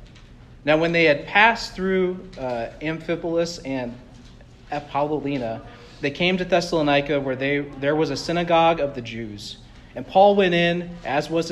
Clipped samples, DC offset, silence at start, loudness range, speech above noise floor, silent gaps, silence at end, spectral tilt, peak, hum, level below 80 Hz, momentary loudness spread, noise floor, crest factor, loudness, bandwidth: under 0.1%; under 0.1%; 0 s; 7 LU; 24 dB; none; 0 s; -5.5 dB/octave; -2 dBFS; none; -48 dBFS; 16 LU; -45 dBFS; 20 dB; -21 LUFS; 12.5 kHz